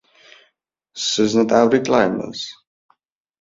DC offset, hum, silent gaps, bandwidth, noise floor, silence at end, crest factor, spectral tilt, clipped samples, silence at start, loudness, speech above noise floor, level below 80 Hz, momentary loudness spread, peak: under 0.1%; none; none; 7.8 kHz; -68 dBFS; 0.9 s; 20 dB; -4 dB/octave; under 0.1%; 0.95 s; -18 LUFS; 51 dB; -58 dBFS; 15 LU; -2 dBFS